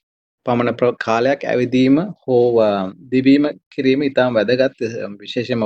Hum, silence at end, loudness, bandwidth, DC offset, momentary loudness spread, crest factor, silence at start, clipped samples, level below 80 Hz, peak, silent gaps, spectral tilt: none; 0 s; -17 LUFS; 7.8 kHz; under 0.1%; 10 LU; 16 dB; 0.45 s; under 0.1%; -56 dBFS; -2 dBFS; 3.66-3.71 s; -7 dB/octave